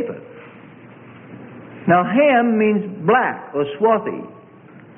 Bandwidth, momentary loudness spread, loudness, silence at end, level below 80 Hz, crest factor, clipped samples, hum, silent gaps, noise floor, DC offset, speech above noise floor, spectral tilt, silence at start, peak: 3.6 kHz; 24 LU; -18 LUFS; 0.65 s; -64 dBFS; 16 dB; under 0.1%; none; none; -43 dBFS; under 0.1%; 27 dB; -11.5 dB/octave; 0 s; -4 dBFS